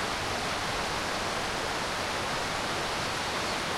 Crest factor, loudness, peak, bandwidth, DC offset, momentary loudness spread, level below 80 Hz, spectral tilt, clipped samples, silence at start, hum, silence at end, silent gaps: 12 dB; -30 LUFS; -18 dBFS; 16.5 kHz; under 0.1%; 0 LU; -50 dBFS; -2.5 dB/octave; under 0.1%; 0 s; none; 0 s; none